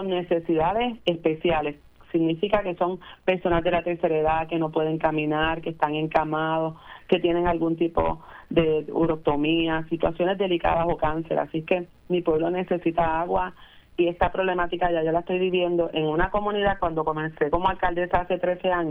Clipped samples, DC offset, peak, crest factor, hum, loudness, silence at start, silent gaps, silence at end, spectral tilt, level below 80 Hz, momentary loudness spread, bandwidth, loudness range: under 0.1%; under 0.1%; -6 dBFS; 18 dB; none; -25 LUFS; 0 s; none; 0 s; -8.5 dB/octave; -42 dBFS; 4 LU; 4.4 kHz; 1 LU